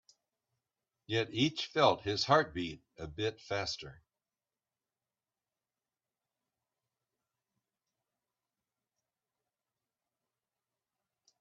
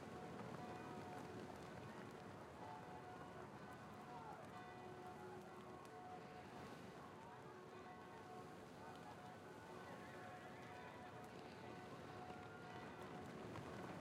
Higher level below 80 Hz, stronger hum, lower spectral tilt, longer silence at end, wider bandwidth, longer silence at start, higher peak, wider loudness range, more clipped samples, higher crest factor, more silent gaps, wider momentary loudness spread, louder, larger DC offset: first, -68 dBFS vs -78 dBFS; neither; second, -3 dB/octave vs -5.5 dB/octave; first, 7.45 s vs 0 s; second, 8 kHz vs 16 kHz; first, 1.1 s vs 0 s; first, -12 dBFS vs -40 dBFS; first, 12 LU vs 2 LU; neither; first, 28 dB vs 16 dB; neither; first, 14 LU vs 4 LU; first, -33 LUFS vs -56 LUFS; neither